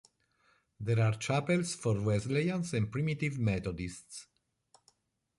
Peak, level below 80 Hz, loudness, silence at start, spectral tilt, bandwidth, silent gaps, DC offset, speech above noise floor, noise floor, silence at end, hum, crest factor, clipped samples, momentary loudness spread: -18 dBFS; -56 dBFS; -33 LUFS; 0.8 s; -6 dB/octave; 11.5 kHz; none; under 0.1%; 40 dB; -72 dBFS; 1.15 s; none; 16 dB; under 0.1%; 12 LU